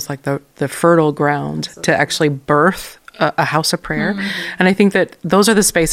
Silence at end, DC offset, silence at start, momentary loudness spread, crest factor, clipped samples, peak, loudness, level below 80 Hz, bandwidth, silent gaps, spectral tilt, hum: 0 s; under 0.1%; 0 s; 10 LU; 16 dB; under 0.1%; 0 dBFS; -15 LUFS; -46 dBFS; 16.5 kHz; none; -4.5 dB/octave; none